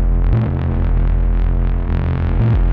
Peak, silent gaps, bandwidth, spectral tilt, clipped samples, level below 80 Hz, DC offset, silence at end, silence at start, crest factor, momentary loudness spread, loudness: -4 dBFS; none; 3.9 kHz; -11 dB/octave; under 0.1%; -16 dBFS; under 0.1%; 0 s; 0 s; 10 dB; 3 LU; -18 LUFS